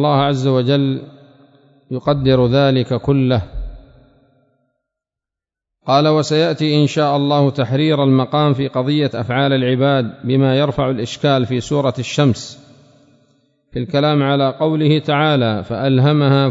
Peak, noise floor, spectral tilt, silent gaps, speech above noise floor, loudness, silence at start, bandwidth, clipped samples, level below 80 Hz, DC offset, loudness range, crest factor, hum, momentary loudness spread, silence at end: 0 dBFS; -86 dBFS; -7 dB/octave; none; 71 dB; -16 LUFS; 0 s; 7.8 kHz; under 0.1%; -42 dBFS; under 0.1%; 4 LU; 16 dB; none; 7 LU; 0 s